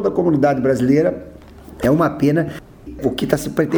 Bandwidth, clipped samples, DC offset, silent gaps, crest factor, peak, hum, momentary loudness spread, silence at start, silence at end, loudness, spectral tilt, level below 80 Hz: over 20 kHz; under 0.1%; under 0.1%; none; 18 dB; 0 dBFS; none; 11 LU; 0 s; 0 s; -18 LUFS; -7 dB/octave; -42 dBFS